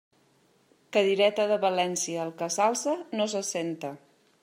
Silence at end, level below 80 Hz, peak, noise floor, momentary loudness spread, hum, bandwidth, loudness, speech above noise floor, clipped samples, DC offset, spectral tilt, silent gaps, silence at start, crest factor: 0.45 s; -84 dBFS; -10 dBFS; -65 dBFS; 9 LU; none; 16 kHz; -27 LUFS; 38 dB; under 0.1%; under 0.1%; -3 dB/octave; none; 0.9 s; 18 dB